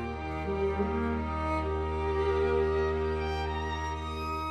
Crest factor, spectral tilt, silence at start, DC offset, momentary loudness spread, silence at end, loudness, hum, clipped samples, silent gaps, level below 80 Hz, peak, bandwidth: 14 dB; -7.5 dB/octave; 0 s; under 0.1%; 7 LU; 0 s; -31 LUFS; none; under 0.1%; none; -38 dBFS; -18 dBFS; 9.2 kHz